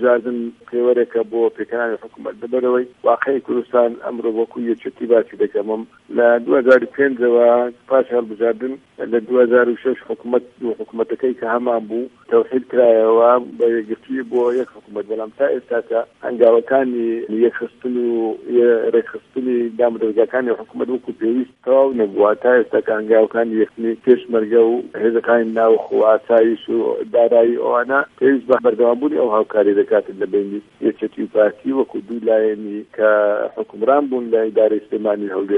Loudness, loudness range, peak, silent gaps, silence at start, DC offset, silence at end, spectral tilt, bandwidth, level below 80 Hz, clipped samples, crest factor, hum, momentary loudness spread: -17 LUFS; 4 LU; 0 dBFS; none; 0 s; under 0.1%; 0 s; -8 dB/octave; 4.4 kHz; -68 dBFS; under 0.1%; 16 dB; none; 10 LU